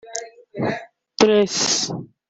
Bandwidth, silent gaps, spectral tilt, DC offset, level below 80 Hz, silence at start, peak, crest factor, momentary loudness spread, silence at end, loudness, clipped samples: 8.4 kHz; none; -3 dB/octave; under 0.1%; -60 dBFS; 0.05 s; -2 dBFS; 20 dB; 17 LU; 0.25 s; -19 LUFS; under 0.1%